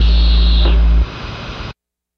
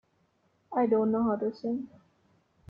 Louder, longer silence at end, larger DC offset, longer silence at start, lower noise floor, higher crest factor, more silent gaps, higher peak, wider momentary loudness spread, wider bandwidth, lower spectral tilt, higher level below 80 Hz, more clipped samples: first, -14 LUFS vs -29 LUFS; second, 0.45 s vs 0.8 s; neither; second, 0 s vs 0.7 s; second, -37 dBFS vs -71 dBFS; second, 10 dB vs 16 dB; neither; first, -4 dBFS vs -14 dBFS; first, 15 LU vs 10 LU; about the same, 5.6 kHz vs 5.6 kHz; second, -7 dB/octave vs -10 dB/octave; first, -12 dBFS vs -68 dBFS; neither